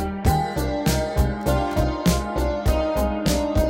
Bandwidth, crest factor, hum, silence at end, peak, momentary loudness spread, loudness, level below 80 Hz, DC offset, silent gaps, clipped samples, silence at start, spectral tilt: 17 kHz; 16 dB; none; 0 s; -6 dBFS; 2 LU; -23 LUFS; -26 dBFS; under 0.1%; none; under 0.1%; 0 s; -6 dB/octave